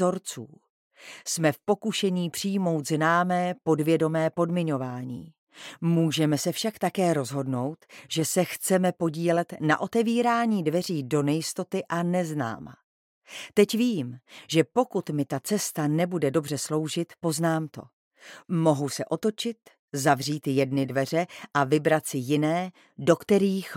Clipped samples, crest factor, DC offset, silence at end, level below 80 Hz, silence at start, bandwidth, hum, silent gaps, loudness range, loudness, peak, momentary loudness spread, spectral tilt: under 0.1%; 20 dB; under 0.1%; 0 s; -72 dBFS; 0 s; 17 kHz; none; 0.70-0.91 s, 5.38-5.47 s, 12.83-13.21 s, 17.93-18.11 s, 19.79-19.88 s; 3 LU; -26 LUFS; -6 dBFS; 11 LU; -5.5 dB/octave